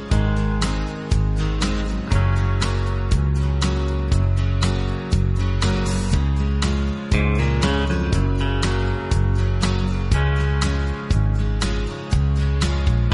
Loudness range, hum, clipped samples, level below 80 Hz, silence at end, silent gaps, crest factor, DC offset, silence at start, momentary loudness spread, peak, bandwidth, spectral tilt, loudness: 1 LU; none; under 0.1%; -22 dBFS; 0 s; none; 16 dB; under 0.1%; 0 s; 3 LU; -4 dBFS; 11.5 kHz; -6 dB/octave; -21 LUFS